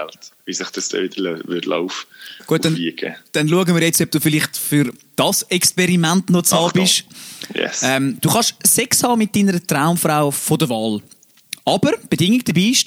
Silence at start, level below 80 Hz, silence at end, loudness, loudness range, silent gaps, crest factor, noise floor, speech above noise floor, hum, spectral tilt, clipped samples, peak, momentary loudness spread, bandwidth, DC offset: 0 s; -60 dBFS; 0 s; -17 LUFS; 4 LU; none; 16 dB; -37 dBFS; 19 dB; none; -3.5 dB/octave; under 0.1%; -2 dBFS; 12 LU; over 20 kHz; under 0.1%